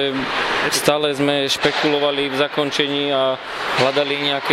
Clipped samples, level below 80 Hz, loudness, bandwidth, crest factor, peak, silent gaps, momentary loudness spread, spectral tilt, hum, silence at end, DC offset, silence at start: under 0.1%; -54 dBFS; -18 LUFS; 16 kHz; 18 dB; 0 dBFS; none; 3 LU; -3 dB/octave; none; 0 s; under 0.1%; 0 s